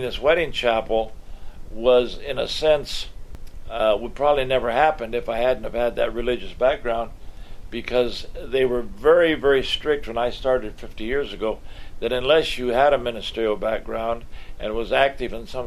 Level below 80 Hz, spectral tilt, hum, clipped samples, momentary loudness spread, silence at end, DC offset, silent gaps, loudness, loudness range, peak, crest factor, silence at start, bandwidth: -36 dBFS; -4.5 dB/octave; none; under 0.1%; 12 LU; 0 s; under 0.1%; none; -22 LUFS; 3 LU; -2 dBFS; 20 dB; 0 s; 14 kHz